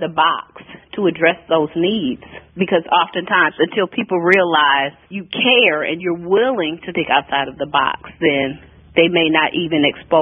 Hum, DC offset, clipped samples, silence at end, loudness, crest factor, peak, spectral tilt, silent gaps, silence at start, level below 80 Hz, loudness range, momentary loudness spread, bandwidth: none; under 0.1%; under 0.1%; 0 s; -16 LUFS; 16 dB; 0 dBFS; -7 dB/octave; none; 0 s; -54 dBFS; 3 LU; 11 LU; 6.2 kHz